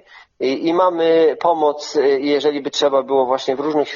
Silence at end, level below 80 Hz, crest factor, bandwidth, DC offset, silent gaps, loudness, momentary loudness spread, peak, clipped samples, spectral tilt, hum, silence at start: 0 s; -68 dBFS; 14 dB; 7.4 kHz; under 0.1%; none; -17 LUFS; 5 LU; -2 dBFS; under 0.1%; -2.5 dB/octave; none; 0.15 s